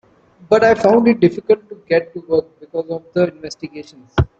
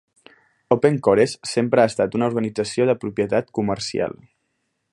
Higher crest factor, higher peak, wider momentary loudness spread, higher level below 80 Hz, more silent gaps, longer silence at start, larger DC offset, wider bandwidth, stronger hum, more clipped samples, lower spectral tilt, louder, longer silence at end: about the same, 16 dB vs 20 dB; about the same, -2 dBFS vs -2 dBFS; first, 18 LU vs 7 LU; first, -40 dBFS vs -56 dBFS; neither; second, 0.5 s vs 0.7 s; neither; second, 8 kHz vs 11.5 kHz; neither; neither; first, -7.5 dB/octave vs -5.5 dB/octave; first, -16 LUFS vs -21 LUFS; second, 0.15 s vs 0.8 s